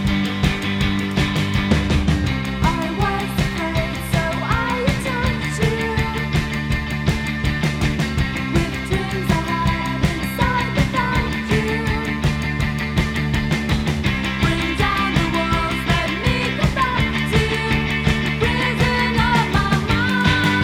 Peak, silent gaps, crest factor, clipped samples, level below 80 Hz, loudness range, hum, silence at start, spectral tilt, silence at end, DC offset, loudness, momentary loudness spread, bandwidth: -2 dBFS; none; 18 dB; under 0.1%; -28 dBFS; 3 LU; none; 0 s; -5.5 dB/octave; 0 s; under 0.1%; -20 LUFS; 4 LU; 16.5 kHz